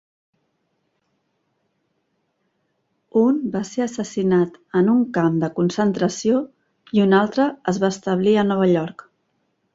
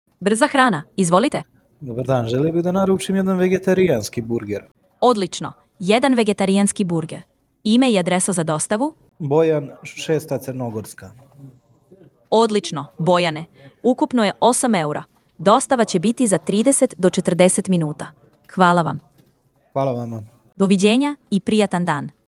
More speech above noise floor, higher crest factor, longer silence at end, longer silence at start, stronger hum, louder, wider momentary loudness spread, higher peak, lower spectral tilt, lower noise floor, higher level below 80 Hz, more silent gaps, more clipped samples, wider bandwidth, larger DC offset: first, 52 dB vs 42 dB; about the same, 16 dB vs 18 dB; first, 0.85 s vs 0.2 s; first, 3.15 s vs 0.2 s; neither; about the same, -20 LUFS vs -18 LUFS; second, 7 LU vs 14 LU; second, -4 dBFS vs 0 dBFS; first, -6.5 dB/octave vs -5 dB/octave; first, -71 dBFS vs -60 dBFS; about the same, -62 dBFS vs -58 dBFS; second, none vs 4.71-4.75 s; neither; second, 7.8 kHz vs 14 kHz; neither